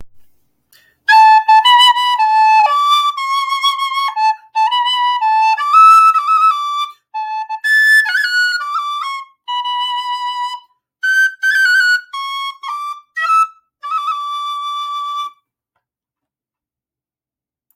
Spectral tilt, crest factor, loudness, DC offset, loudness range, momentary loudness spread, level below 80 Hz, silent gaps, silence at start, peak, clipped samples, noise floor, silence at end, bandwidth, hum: 5.5 dB/octave; 14 dB; -12 LUFS; under 0.1%; 9 LU; 15 LU; -74 dBFS; none; 0 s; 0 dBFS; under 0.1%; under -90 dBFS; 2.45 s; 16.5 kHz; none